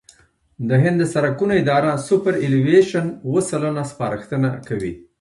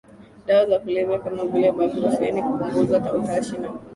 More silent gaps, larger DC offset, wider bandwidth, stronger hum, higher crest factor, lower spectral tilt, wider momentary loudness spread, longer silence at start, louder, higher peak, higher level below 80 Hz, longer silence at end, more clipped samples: neither; neither; about the same, 11.5 kHz vs 11.5 kHz; neither; about the same, 16 dB vs 16 dB; about the same, -7 dB/octave vs -6.5 dB/octave; first, 11 LU vs 6 LU; first, 0.6 s vs 0.2 s; first, -19 LUFS vs -22 LUFS; first, -2 dBFS vs -6 dBFS; about the same, -52 dBFS vs -56 dBFS; first, 0.2 s vs 0 s; neither